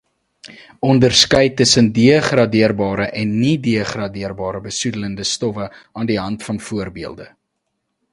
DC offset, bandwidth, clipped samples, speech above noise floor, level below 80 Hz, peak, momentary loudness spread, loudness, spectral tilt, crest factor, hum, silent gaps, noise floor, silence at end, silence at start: under 0.1%; 11.5 kHz; under 0.1%; 56 dB; -46 dBFS; 0 dBFS; 14 LU; -16 LUFS; -4.5 dB/octave; 18 dB; none; none; -73 dBFS; 0.85 s; 0.45 s